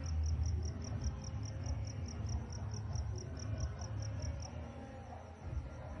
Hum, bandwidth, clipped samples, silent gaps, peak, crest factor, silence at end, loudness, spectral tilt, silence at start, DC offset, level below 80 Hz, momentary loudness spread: none; 7 kHz; under 0.1%; none; -26 dBFS; 14 dB; 0 s; -43 LUFS; -6 dB/octave; 0 s; under 0.1%; -46 dBFS; 10 LU